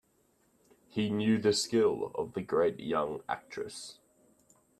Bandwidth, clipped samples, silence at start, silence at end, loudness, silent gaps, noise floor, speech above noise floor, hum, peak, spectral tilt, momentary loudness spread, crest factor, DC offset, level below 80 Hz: 13.5 kHz; under 0.1%; 0.95 s; 0.85 s; -31 LUFS; none; -71 dBFS; 40 dB; none; -16 dBFS; -4.5 dB/octave; 13 LU; 18 dB; under 0.1%; -70 dBFS